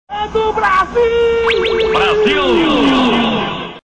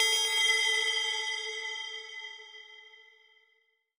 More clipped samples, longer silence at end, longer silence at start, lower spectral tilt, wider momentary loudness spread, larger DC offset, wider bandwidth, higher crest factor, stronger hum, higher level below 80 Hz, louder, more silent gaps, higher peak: neither; second, 0.05 s vs 0.95 s; about the same, 0.1 s vs 0 s; first, -5 dB/octave vs 6.5 dB/octave; second, 5 LU vs 22 LU; neither; second, 9.4 kHz vs 16.5 kHz; second, 8 dB vs 20 dB; neither; first, -36 dBFS vs under -90 dBFS; first, -13 LUFS vs -28 LUFS; neither; first, -4 dBFS vs -12 dBFS